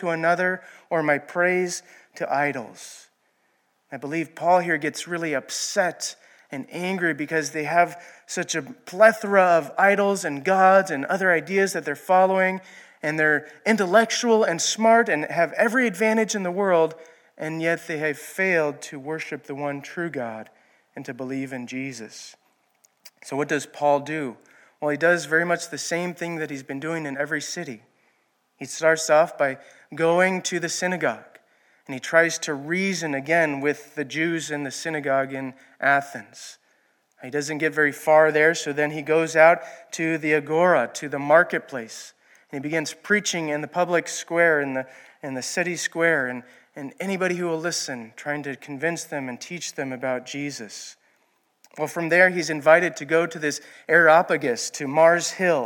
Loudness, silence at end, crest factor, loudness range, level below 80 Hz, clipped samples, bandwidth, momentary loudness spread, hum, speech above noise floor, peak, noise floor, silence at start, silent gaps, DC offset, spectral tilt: -22 LUFS; 0 s; 22 dB; 9 LU; -82 dBFS; under 0.1%; 17.5 kHz; 16 LU; none; 45 dB; -2 dBFS; -68 dBFS; 0 s; none; under 0.1%; -4 dB/octave